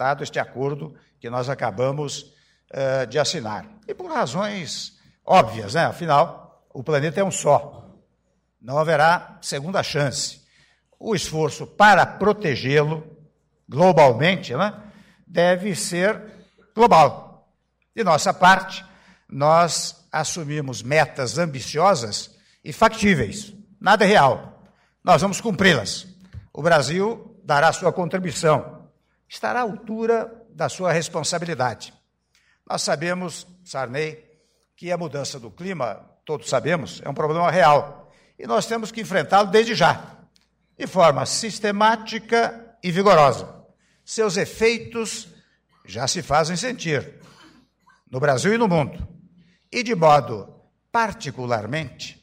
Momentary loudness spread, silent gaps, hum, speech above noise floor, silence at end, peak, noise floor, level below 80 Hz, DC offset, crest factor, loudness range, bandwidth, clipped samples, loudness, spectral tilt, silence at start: 18 LU; none; none; 48 dB; 0.1 s; -6 dBFS; -68 dBFS; -54 dBFS; under 0.1%; 16 dB; 7 LU; 16 kHz; under 0.1%; -21 LUFS; -4.5 dB/octave; 0 s